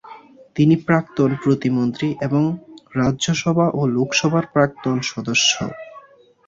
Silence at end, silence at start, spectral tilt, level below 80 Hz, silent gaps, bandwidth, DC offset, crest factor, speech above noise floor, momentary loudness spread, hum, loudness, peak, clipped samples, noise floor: 0.5 s; 0.05 s; -5 dB/octave; -52 dBFS; none; 7.8 kHz; under 0.1%; 18 dB; 29 dB; 7 LU; none; -19 LUFS; -2 dBFS; under 0.1%; -47 dBFS